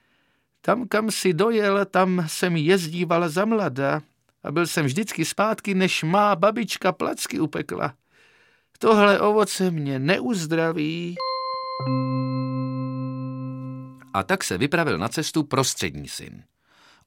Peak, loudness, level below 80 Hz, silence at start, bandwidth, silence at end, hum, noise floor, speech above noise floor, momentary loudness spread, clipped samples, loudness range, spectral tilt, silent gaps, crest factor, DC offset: -4 dBFS; -23 LUFS; -62 dBFS; 0.65 s; 17 kHz; 0.7 s; none; -68 dBFS; 45 dB; 10 LU; under 0.1%; 5 LU; -5 dB/octave; none; 20 dB; under 0.1%